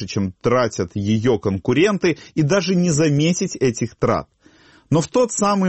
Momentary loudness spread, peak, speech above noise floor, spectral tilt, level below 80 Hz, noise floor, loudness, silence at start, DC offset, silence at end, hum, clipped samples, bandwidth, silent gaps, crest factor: 5 LU; -4 dBFS; 33 dB; -5.5 dB/octave; -50 dBFS; -51 dBFS; -19 LUFS; 0 s; under 0.1%; 0 s; none; under 0.1%; 8.6 kHz; none; 14 dB